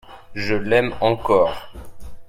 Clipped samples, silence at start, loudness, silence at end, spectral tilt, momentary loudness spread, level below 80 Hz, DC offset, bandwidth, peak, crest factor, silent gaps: under 0.1%; 0.05 s; -20 LUFS; 0.05 s; -6.5 dB/octave; 14 LU; -42 dBFS; under 0.1%; 15 kHz; -2 dBFS; 18 dB; none